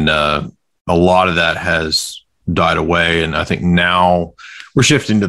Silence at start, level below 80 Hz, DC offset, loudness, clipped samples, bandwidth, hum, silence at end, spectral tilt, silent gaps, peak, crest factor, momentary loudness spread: 0 s; -40 dBFS; under 0.1%; -14 LUFS; under 0.1%; 15 kHz; none; 0 s; -4.5 dB/octave; 0.81-0.85 s; 0 dBFS; 14 dB; 14 LU